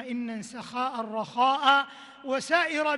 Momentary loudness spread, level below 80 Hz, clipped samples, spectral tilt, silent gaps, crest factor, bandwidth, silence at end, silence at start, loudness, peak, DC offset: 14 LU; -76 dBFS; under 0.1%; -3 dB/octave; none; 18 dB; 12 kHz; 0 s; 0 s; -26 LUFS; -8 dBFS; under 0.1%